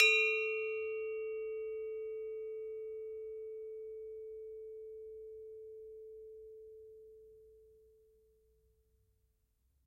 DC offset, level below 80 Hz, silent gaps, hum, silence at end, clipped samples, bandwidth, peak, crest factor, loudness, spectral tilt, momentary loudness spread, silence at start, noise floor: under 0.1%; -76 dBFS; none; none; 2.1 s; under 0.1%; 12.5 kHz; -14 dBFS; 26 dB; -39 LUFS; 0.5 dB/octave; 19 LU; 0 s; -77 dBFS